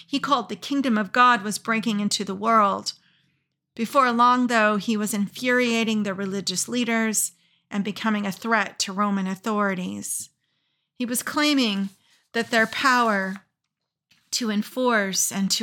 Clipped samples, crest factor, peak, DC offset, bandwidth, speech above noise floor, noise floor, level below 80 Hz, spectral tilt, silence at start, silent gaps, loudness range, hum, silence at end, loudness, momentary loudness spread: under 0.1%; 18 dB; -6 dBFS; under 0.1%; 18 kHz; 59 dB; -82 dBFS; -80 dBFS; -3 dB/octave; 0.1 s; none; 4 LU; none; 0 s; -23 LUFS; 11 LU